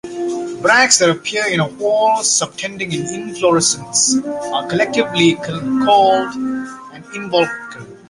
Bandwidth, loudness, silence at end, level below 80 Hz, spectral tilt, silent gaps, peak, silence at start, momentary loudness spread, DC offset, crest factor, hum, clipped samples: 11.5 kHz; -15 LUFS; 0.15 s; -56 dBFS; -2.5 dB/octave; none; 0 dBFS; 0.05 s; 12 LU; under 0.1%; 16 dB; none; under 0.1%